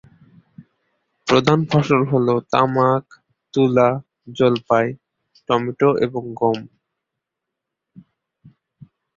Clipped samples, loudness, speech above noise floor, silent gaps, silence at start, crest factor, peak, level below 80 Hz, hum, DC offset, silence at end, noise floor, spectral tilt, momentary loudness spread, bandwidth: under 0.1%; -18 LUFS; 65 dB; none; 0.6 s; 20 dB; -2 dBFS; -58 dBFS; none; under 0.1%; 2.5 s; -82 dBFS; -7 dB/octave; 12 LU; 7.6 kHz